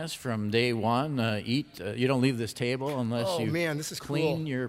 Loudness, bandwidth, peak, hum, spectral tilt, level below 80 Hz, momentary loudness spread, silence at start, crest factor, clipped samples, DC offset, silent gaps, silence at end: -29 LUFS; 16 kHz; -12 dBFS; none; -5.5 dB/octave; -64 dBFS; 6 LU; 0 s; 16 dB; under 0.1%; under 0.1%; none; 0 s